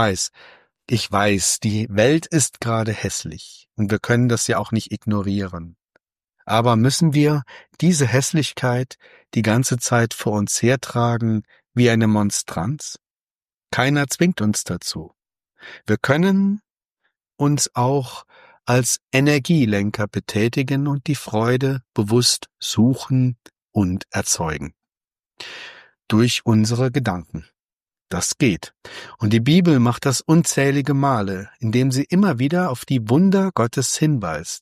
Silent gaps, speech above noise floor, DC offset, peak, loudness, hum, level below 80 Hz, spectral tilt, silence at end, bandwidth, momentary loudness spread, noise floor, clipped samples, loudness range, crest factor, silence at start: 13.21-13.27 s, 13.36-13.41 s, 13.57-13.61 s, 23.62-23.66 s, 27.61-27.67 s; over 71 dB; under 0.1%; -2 dBFS; -19 LUFS; none; -54 dBFS; -5 dB/octave; 0.05 s; 15 kHz; 12 LU; under -90 dBFS; under 0.1%; 4 LU; 18 dB; 0 s